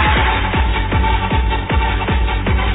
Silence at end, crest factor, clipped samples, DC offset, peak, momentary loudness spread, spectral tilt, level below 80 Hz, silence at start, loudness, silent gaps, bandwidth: 0 s; 12 dB; under 0.1%; 0.4%; -2 dBFS; 3 LU; -9.5 dB/octave; -18 dBFS; 0 s; -17 LUFS; none; 4 kHz